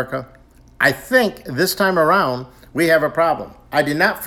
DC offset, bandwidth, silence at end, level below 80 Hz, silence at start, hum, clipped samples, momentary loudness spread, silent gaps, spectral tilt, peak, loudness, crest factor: under 0.1%; 19.5 kHz; 0 s; -50 dBFS; 0 s; none; under 0.1%; 11 LU; none; -4.5 dB/octave; 0 dBFS; -17 LUFS; 18 dB